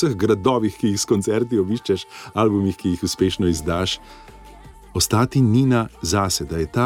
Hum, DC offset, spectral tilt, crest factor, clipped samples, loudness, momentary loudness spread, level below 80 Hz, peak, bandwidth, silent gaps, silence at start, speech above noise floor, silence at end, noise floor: none; under 0.1%; -5.5 dB/octave; 16 dB; under 0.1%; -20 LUFS; 7 LU; -42 dBFS; -4 dBFS; 17 kHz; none; 0 s; 23 dB; 0 s; -42 dBFS